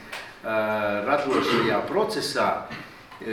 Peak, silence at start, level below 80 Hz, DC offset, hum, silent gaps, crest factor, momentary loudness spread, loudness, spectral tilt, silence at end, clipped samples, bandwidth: -8 dBFS; 0 s; -60 dBFS; under 0.1%; none; none; 18 dB; 15 LU; -24 LUFS; -4.5 dB/octave; 0 s; under 0.1%; 19 kHz